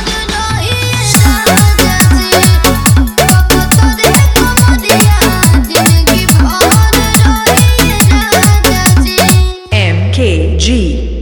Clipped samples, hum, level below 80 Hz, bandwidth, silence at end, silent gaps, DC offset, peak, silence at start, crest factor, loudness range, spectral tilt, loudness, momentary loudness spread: 1%; none; -14 dBFS; over 20 kHz; 0 s; none; under 0.1%; 0 dBFS; 0 s; 8 dB; 1 LU; -4 dB/octave; -8 LUFS; 4 LU